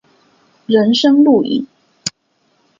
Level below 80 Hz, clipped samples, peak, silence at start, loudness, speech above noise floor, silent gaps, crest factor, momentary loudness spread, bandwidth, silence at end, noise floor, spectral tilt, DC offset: -62 dBFS; under 0.1%; 0 dBFS; 0.7 s; -14 LUFS; 50 dB; none; 14 dB; 15 LU; 7.8 kHz; 0.7 s; -61 dBFS; -4.5 dB/octave; under 0.1%